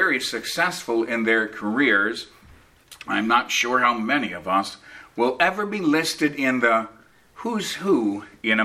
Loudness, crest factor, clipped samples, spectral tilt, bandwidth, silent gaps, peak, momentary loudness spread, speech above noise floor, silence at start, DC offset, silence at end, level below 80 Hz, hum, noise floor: -22 LUFS; 20 dB; under 0.1%; -3.5 dB/octave; 15.5 kHz; none; -4 dBFS; 12 LU; 29 dB; 0 s; under 0.1%; 0 s; -62 dBFS; none; -52 dBFS